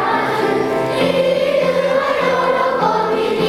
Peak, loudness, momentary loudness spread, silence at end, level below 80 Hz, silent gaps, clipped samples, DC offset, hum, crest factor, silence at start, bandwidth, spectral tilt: -4 dBFS; -16 LUFS; 2 LU; 0 s; -50 dBFS; none; under 0.1%; under 0.1%; none; 12 dB; 0 s; 15.5 kHz; -5.5 dB/octave